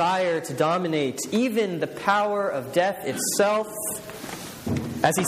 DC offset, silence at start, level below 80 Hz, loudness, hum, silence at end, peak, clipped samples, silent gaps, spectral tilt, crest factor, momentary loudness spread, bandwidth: under 0.1%; 0 s; -58 dBFS; -25 LUFS; none; 0 s; -4 dBFS; under 0.1%; none; -4 dB/octave; 22 dB; 9 LU; 15.5 kHz